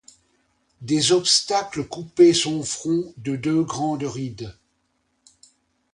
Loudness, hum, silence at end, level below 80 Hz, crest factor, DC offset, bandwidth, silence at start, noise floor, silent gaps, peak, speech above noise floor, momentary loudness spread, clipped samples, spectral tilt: -21 LUFS; none; 1.4 s; -58 dBFS; 20 dB; under 0.1%; 11 kHz; 0.8 s; -70 dBFS; none; -4 dBFS; 49 dB; 15 LU; under 0.1%; -4 dB/octave